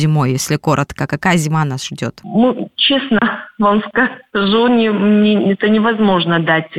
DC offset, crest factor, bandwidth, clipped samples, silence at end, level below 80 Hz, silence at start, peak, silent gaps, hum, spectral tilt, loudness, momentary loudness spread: under 0.1%; 12 dB; 14 kHz; under 0.1%; 0 s; -48 dBFS; 0 s; -2 dBFS; none; none; -5.5 dB/octave; -14 LUFS; 6 LU